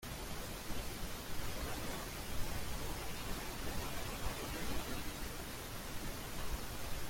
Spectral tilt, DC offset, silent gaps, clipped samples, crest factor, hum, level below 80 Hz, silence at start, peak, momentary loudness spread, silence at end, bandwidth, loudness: -3.5 dB/octave; under 0.1%; none; under 0.1%; 16 dB; none; -48 dBFS; 0 s; -24 dBFS; 3 LU; 0 s; 16.5 kHz; -44 LUFS